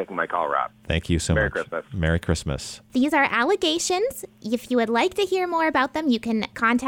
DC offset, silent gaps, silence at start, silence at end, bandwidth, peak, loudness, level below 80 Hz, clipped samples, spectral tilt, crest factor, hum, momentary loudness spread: under 0.1%; none; 0 s; 0 s; 19.5 kHz; -8 dBFS; -23 LUFS; -40 dBFS; under 0.1%; -4.5 dB/octave; 14 dB; none; 9 LU